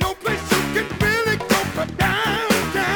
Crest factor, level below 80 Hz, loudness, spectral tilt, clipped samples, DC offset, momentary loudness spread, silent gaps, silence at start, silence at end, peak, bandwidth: 18 dB; -40 dBFS; -20 LUFS; -4 dB/octave; under 0.1%; under 0.1%; 4 LU; none; 0 s; 0 s; -2 dBFS; over 20 kHz